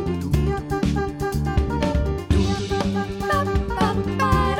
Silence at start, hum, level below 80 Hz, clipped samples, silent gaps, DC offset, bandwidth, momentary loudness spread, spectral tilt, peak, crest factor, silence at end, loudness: 0 s; none; -28 dBFS; under 0.1%; none; under 0.1%; 17.5 kHz; 3 LU; -6.5 dB/octave; -6 dBFS; 16 dB; 0 s; -23 LUFS